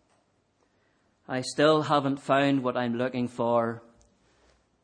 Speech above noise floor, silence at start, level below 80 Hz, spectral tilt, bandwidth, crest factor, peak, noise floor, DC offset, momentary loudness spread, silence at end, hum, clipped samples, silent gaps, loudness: 44 dB; 1.3 s; -72 dBFS; -5.5 dB/octave; 10 kHz; 20 dB; -8 dBFS; -70 dBFS; under 0.1%; 10 LU; 1.05 s; none; under 0.1%; none; -26 LUFS